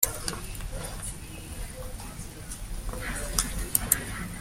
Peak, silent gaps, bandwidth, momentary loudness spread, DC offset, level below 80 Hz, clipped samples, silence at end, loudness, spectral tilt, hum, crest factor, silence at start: -2 dBFS; none; 16.5 kHz; 14 LU; under 0.1%; -38 dBFS; under 0.1%; 0 s; -32 LUFS; -2.5 dB/octave; none; 30 dB; 0 s